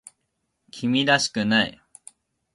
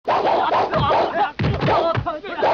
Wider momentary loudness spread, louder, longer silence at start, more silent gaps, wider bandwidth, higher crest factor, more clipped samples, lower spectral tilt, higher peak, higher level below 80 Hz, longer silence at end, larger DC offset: first, 10 LU vs 4 LU; second, -22 LUFS vs -19 LUFS; first, 0.75 s vs 0.05 s; neither; first, 11.5 kHz vs 7 kHz; first, 20 dB vs 12 dB; neither; about the same, -3.5 dB/octave vs -4 dB/octave; about the same, -6 dBFS vs -8 dBFS; second, -62 dBFS vs -40 dBFS; first, 0.85 s vs 0 s; neither